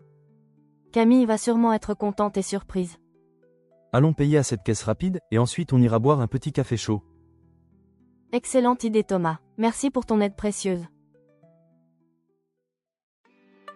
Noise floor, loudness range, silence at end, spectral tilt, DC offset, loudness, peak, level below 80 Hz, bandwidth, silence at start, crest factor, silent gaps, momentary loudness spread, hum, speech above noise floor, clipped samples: -83 dBFS; 6 LU; 0.05 s; -6.5 dB/octave; under 0.1%; -24 LUFS; -6 dBFS; -52 dBFS; 12 kHz; 0.95 s; 18 dB; 13.03-13.24 s; 9 LU; none; 61 dB; under 0.1%